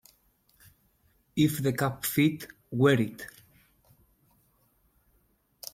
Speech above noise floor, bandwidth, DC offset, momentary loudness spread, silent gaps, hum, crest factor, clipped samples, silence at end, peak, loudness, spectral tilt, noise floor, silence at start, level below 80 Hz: 43 dB; 16.5 kHz; under 0.1%; 20 LU; none; none; 22 dB; under 0.1%; 2.45 s; -10 dBFS; -27 LUFS; -5.5 dB/octave; -69 dBFS; 1.35 s; -64 dBFS